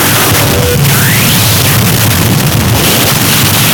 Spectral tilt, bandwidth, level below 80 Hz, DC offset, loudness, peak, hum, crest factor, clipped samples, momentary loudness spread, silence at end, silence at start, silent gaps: -3.5 dB/octave; over 20 kHz; -26 dBFS; 0.6%; -6 LUFS; 0 dBFS; none; 8 dB; 0.5%; 2 LU; 0 s; 0 s; none